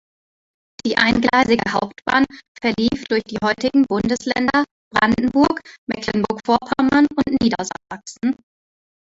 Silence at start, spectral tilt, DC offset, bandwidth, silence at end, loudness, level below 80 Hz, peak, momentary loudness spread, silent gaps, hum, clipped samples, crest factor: 0.85 s; -5 dB/octave; under 0.1%; 8 kHz; 0.85 s; -19 LUFS; -48 dBFS; -2 dBFS; 10 LU; 2.48-2.55 s, 4.71-4.91 s, 5.78-5.87 s; none; under 0.1%; 18 dB